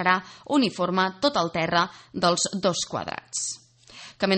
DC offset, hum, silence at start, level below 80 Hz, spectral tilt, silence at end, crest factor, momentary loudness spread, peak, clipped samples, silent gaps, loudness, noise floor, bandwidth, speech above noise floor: under 0.1%; none; 0 s; -62 dBFS; -3.5 dB/octave; 0 s; 20 dB; 9 LU; -6 dBFS; under 0.1%; none; -25 LUFS; -47 dBFS; 8.8 kHz; 22 dB